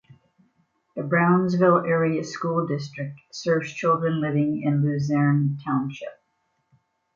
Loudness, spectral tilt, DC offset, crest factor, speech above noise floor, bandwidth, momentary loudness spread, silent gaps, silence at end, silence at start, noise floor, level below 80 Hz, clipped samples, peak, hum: -23 LUFS; -7.5 dB/octave; under 0.1%; 18 dB; 50 dB; 7.6 kHz; 15 LU; none; 1 s; 0.95 s; -72 dBFS; -66 dBFS; under 0.1%; -6 dBFS; none